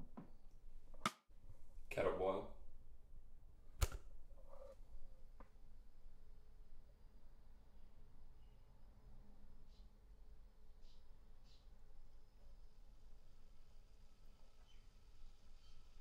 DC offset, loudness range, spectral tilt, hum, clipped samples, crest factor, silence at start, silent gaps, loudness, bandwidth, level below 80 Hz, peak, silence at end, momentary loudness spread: under 0.1%; 21 LU; -4.5 dB/octave; none; under 0.1%; 30 dB; 0 s; none; -47 LUFS; 13 kHz; -56 dBFS; -22 dBFS; 0 s; 23 LU